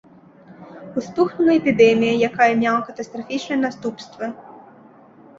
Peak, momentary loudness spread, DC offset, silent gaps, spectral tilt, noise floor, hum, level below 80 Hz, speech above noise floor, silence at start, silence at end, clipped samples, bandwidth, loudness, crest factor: -2 dBFS; 16 LU; under 0.1%; none; -5.5 dB/octave; -47 dBFS; none; -62 dBFS; 28 dB; 0.6 s; 0.8 s; under 0.1%; 7.6 kHz; -19 LUFS; 18 dB